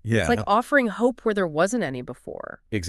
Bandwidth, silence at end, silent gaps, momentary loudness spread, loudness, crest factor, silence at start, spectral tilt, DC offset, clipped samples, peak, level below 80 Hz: 13 kHz; 0 s; none; 16 LU; -23 LUFS; 18 dB; 0.05 s; -5.5 dB/octave; under 0.1%; under 0.1%; -6 dBFS; -48 dBFS